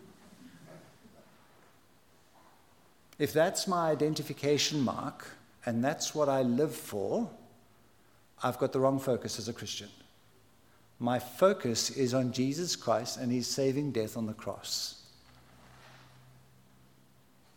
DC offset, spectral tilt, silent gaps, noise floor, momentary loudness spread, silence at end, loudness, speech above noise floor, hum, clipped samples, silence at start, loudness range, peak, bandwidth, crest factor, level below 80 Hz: under 0.1%; -4.5 dB/octave; none; -65 dBFS; 12 LU; 1.6 s; -32 LUFS; 34 dB; none; under 0.1%; 0 s; 6 LU; -12 dBFS; 17.5 kHz; 22 dB; -74 dBFS